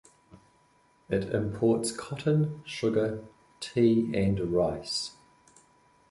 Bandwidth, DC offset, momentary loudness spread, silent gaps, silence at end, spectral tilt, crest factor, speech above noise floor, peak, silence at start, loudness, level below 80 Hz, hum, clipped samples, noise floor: 11.5 kHz; under 0.1%; 9 LU; none; 1 s; -6 dB/octave; 18 dB; 37 dB; -12 dBFS; 0.35 s; -28 LUFS; -54 dBFS; none; under 0.1%; -65 dBFS